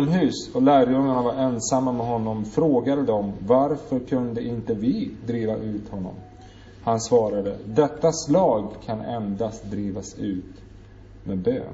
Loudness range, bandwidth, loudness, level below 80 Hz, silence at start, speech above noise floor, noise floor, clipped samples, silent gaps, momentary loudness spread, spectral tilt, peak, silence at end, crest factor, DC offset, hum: 6 LU; 8 kHz; -24 LUFS; -50 dBFS; 0 s; 22 dB; -45 dBFS; under 0.1%; none; 11 LU; -6.5 dB/octave; -6 dBFS; 0 s; 18 dB; under 0.1%; none